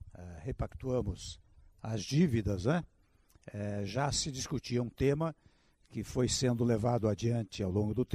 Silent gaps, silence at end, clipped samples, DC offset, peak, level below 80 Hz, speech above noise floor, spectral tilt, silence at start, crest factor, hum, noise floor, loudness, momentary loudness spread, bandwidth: none; 0 s; under 0.1%; under 0.1%; -16 dBFS; -52 dBFS; 33 dB; -5.5 dB/octave; 0 s; 18 dB; none; -66 dBFS; -34 LUFS; 15 LU; 14.5 kHz